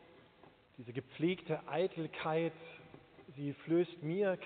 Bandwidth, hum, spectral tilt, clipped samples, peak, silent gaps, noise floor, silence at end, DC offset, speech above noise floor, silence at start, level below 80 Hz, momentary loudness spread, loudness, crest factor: 4.5 kHz; none; -5.5 dB/octave; under 0.1%; -22 dBFS; none; -64 dBFS; 0 s; under 0.1%; 27 dB; 0.45 s; -78 dBFS; 20 LU; -38 LUFS; 16 dB